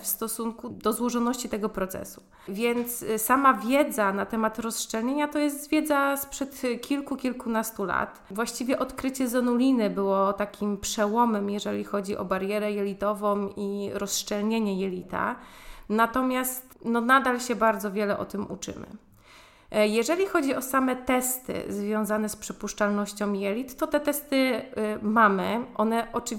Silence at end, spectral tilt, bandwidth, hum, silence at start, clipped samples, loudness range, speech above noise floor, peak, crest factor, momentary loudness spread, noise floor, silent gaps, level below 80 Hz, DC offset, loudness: 0 s; -4 dB/octave; 17 kHz; none; 0 s; under 0.1%; 3 LU; 27 dB; -6 dBFS; 20 dB; 9 LU; -53 dBFS; none; -56 dBFS; under 0.1%; -27 LUFS